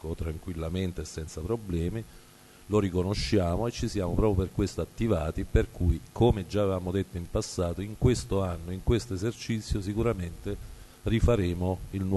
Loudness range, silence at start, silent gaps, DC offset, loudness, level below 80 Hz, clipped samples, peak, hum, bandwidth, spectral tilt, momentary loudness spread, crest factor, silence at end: 3 LU; 0.05 s; none; under 0.1%; -30 LUFS; -36 dBFS; under 0.1%; -10 dBFS; none; 12.5 kHz; -6.5 dB/octave; 10 LU; 20 dB; 0 s